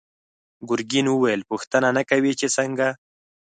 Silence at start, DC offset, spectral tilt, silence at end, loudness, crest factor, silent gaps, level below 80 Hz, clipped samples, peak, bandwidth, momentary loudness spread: 0.6 s; under 0.1%; -4 dB/octave; 0.55 s; -22 LUFS; 18 dB; 1.67-1.71 s; -68 dBFS; under 0.1%; -4 dBFS; 9.4 kHz; 7 LU